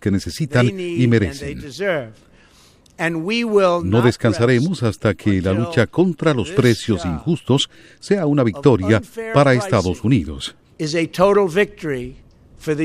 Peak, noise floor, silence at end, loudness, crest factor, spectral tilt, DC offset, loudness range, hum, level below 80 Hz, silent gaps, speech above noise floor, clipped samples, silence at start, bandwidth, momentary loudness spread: 0 dBFS; -51 dBFS; 0 s; -18 LUFS; 18 dB; -6.5 dB/octave; under 0.1%; 3 LU; none; -44 dBFS; none; 33 dB; under 0.1%; 0 s; 14 kHz; 11 LU